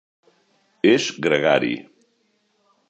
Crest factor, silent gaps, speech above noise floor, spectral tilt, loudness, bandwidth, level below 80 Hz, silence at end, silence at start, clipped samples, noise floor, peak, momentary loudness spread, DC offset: 20 dB; none; 48 dB; -4.5 dB/octave; -20 LUFS; 8.4 kHz; -66 dBFS; 1.1 s; 0.85 s; under 0.1%; -67 dBFS; -2 dBFS; 8 LU; under 0.1%